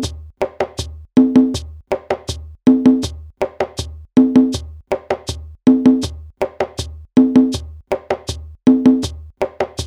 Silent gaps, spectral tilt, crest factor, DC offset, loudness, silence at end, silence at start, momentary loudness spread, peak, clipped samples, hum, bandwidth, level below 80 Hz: none; -6 dB/octave; 16 dB; under 0.1%; -17 LUFS; 0 s; 0 s; 15 LU; 0 dBFS; under 0.1%; none; 11.5 kHz; -36 dBFS